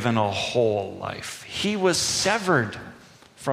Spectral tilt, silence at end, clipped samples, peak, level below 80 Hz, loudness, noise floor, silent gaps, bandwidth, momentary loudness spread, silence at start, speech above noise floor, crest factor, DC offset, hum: -3.5 dB/octave; 0 s; under 0.1%; -6 dBFS; -56 dBFS; -24 LUFS; -49 dBFS; none; 15.5 kHz; 12 LU; 0 s; 25 dB; 18 dB; under 0.1%; none